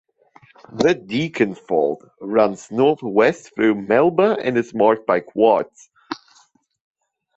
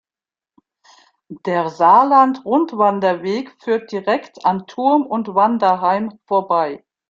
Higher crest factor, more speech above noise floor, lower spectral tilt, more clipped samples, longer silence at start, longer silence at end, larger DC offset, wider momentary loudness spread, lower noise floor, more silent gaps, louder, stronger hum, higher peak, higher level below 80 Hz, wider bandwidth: about the same, 18 dB vs 16 dB; second, 39 dB vs over 73 dB; about the same, -6 dB/octave vs -7 dB/octave; neither; second, 0.7 s vs 1.3 s; first, 1.2 s vs 0.35 s; neither; first, 15 LU vs 10 LU; second, -57 dBFS vs under -90 dBFS; neither; about the same, -19 LUFS vs -17 LUFS; neither; about the same, -2 dBFS vs -2 dBFS; first, -60 dBFS vs -66 dBFS; about the same, 8 kHz vs 7.6 kHz